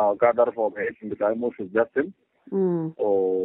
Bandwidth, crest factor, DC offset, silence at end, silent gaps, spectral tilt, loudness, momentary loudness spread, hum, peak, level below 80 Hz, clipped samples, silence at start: 3.9 kHz; 18 dB; under 0.1%; 0 s; none; -7.5 dB/octave; -25 LUFS; 10 LU; none; -6 dBFS; -68 dBFS; under 0.1%; 0 s